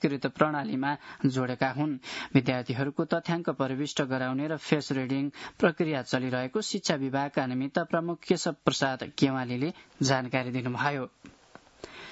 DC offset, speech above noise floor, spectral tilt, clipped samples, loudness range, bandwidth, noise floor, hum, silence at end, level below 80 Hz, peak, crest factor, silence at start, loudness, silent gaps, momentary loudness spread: under 0.1%; 21 dB; -5.5 dB/octave; under 0.1%; 1 LU; 8 kHz; -50 dBFS; none; 0 s; -68 dBFS; -8 dBFS; 22 dB; 0 s; -29 LUFS; none; 5 LU